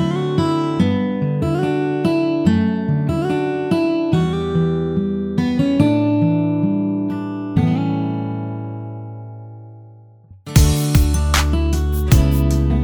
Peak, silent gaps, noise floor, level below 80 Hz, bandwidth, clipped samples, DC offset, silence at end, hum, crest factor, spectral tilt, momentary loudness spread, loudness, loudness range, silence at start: 0 dBFS; none; -44 dBFS; -24 dBFS; over 20 kHz; under 0.1%; under 0.1%; 0 s; none; 18 dB; -6.5 dB/octave; 11 LU; -18 LUFS; 5 LU; 0 s